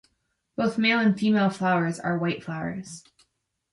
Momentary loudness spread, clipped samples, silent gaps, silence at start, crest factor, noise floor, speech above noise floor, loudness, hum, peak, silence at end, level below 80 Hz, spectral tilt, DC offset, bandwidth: 17 LU; under 0.1%; none; 0.6 s; 16 dB; -75 dBFS; 50 dB; -25 LUFS; none; -10 dBFS; 0.75 s; -66 dBFS; -6 dB/octave; under 0.1%; 11.5 kHz